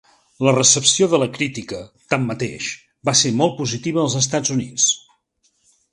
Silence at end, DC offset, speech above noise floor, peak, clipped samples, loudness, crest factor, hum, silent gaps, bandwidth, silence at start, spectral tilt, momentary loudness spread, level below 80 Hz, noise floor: 0.95 s; under 0.1%; 46 dB; 0 dBFS; under 0.1%; -18 LUFS; 20 dB; none; none; 11.5 kHz; 0.4 s; -3 dB/octave; 13 LU; -58 dBFS; -65 dBFS